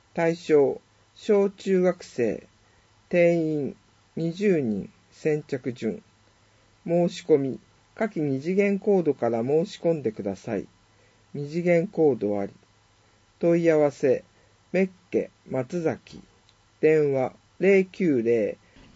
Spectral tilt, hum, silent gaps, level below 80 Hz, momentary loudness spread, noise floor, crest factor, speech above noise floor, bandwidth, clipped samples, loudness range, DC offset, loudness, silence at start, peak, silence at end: -7.5 dB/octave; none; none; -66 dBFS; 12 LU; -61 dBFS; 18 dB; 37 dB; 8 kHz; under 0.1%; 3 LU; under 0.1%; -25 LUFS; 0.15 s; -8 dBFS; 0.4 s